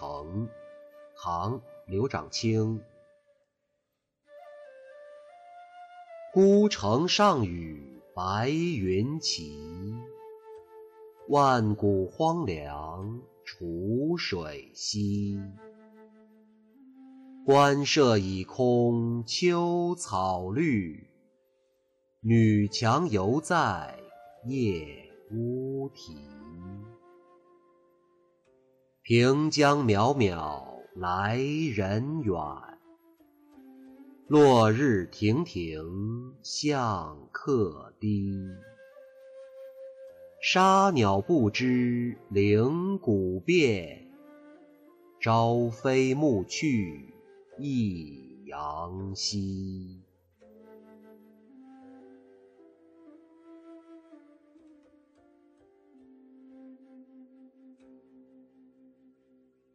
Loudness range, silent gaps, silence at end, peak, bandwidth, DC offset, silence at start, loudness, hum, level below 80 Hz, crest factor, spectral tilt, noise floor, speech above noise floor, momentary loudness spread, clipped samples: 10 LU; none; 2.5 s; -12 dBFS; 12 kHz; under 0.1%; 0 s; -27 LUFS; none; -60 dBFS; 18 dB; -6 dB/octave; -81 dBFS; 55 dB; 23 LU; under 0.1%